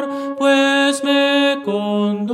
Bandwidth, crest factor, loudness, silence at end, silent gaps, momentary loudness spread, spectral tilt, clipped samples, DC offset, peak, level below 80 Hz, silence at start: 13.5 kHz; 14 dB; -16 LUFS; 0 s; none; 7 LU; -4 dB/octave; under 0.1%; under 0.1%; -2 dBFS; -70 dBFS; 0 s